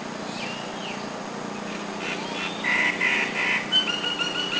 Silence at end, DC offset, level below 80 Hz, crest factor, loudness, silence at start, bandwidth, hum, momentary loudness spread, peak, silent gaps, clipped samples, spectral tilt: 0 s; under 0.1%; -64 dBFS; 16 dB; -25 LUFS; 0 s; 8 kHz; none; 12 LU; -10 dBFS; none; under 0.1%; -2.5 dB/octave